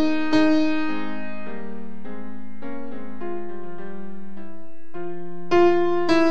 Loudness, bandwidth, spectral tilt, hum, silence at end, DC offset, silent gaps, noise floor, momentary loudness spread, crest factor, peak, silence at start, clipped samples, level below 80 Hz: -23 LUFS; 7.8 kHz; -6 dB/octave; none; 0 s; 8%; none; -44 dBFS; 21 LU; 18 dB; -6 dBFS; 0 s; under 0.1%; -64 dBFS